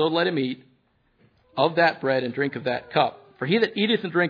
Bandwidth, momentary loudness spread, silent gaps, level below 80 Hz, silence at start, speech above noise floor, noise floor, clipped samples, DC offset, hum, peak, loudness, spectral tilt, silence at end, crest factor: 5.2 kHz; 9 LU; none; -70 dBFS; 0 s; 42 dB; -65 dBFS; under 0.1%; under 0.1%; none; -6 dBFS; -24 LUFS; -7.5 dB/octave; 0 s; 18 dB